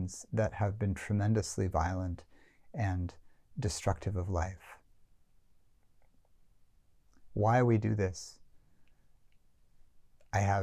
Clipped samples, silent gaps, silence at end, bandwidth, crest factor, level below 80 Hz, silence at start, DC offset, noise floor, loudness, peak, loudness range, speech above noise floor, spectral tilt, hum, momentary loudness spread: under 0.1%; none; 0 s; 12.5 kHz; 18 dB; -48 dBFS; 0 s; under 0.1%; -64 dBFS; -33 LUFS; -16 dBFS; 6 LU; 33 dB; -6.5 dB/octave; none; 15 LU